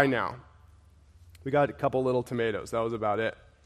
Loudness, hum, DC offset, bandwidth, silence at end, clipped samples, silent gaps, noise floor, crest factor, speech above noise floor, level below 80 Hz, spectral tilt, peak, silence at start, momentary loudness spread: -29 LUFS; none; under 0.1%; 14 kHz; 0.3 s; under 0.1%; none; -57 dBFS; 22 dB; 29 dB; -58 dBFS; -6.5 dB/octave; -6 dBFS; 0 s; 8 LU